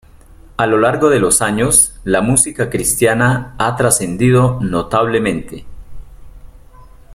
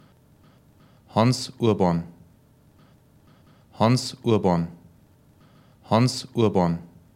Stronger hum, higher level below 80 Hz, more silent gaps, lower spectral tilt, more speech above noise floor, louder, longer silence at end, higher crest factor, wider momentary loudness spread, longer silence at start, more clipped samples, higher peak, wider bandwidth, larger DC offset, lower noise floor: neither; first, -36 dBFS vs -62 dBFS; neither; second, -4.5 dB/octave vs -6.5 dB/octave; second, 27 dB vs 35 dB; first, -13 LUFS vs -23 LUFS; second, 0 s vs 0.3 s; about the same, 16 dB vs 20 dB; about the same, 8 LU vs 7 LU; second, 0.6 s vs 1.15 s; neither; first, 0 dBFS vs -4 dBFS; about the same, 16.5 kHz vs 15.5 kHz; neither; second, -41 dBFS vs -56 dBFS